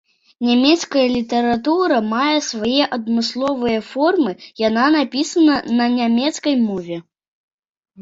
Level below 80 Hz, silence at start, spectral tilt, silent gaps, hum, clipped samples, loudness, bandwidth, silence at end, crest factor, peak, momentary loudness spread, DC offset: -56 dBFS; 0.4 s; -4 dB/octave; 7.28-7.58 s, 7.69-7.81 s; none; under 0.1%; -17 LUFS; 7.8 kHz; 0 s; 16 dB; -2 dBFS; 6 LU; under 0.1%